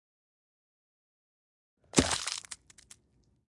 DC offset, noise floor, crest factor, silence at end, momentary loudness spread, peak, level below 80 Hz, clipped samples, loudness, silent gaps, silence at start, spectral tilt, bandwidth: under 0.1%; -70 dBFS; 32 dB; 1 s; 19 LU; -6 dBFS; -56 dBFS; under 0.1%; -30 LUFS; none; 1.95 s; -3 dB/octave; 11.5 kHz